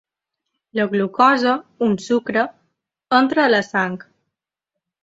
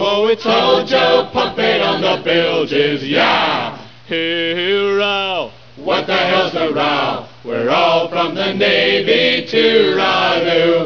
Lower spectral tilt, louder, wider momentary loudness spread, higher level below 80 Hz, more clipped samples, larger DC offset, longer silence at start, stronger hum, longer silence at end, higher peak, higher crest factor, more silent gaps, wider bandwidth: about the same, -5.5 dB/octave vs -5 dB/octave; second, -18 LUFS vs -14 LUFS; about the same, 10 LU vs 8 LU; second, -64 dBFS vs -52 dBFS; neither; second, under 0.1% vs 0.6%; first, 0.75 s vs 0 s; neither; first, 1.05 s vs 0 s; about the same, -2 dBFS vs -2 dBFS; about the same, 18 dB vs 14 dB; neither; first, 7.8 kHz vs 5.4 kHz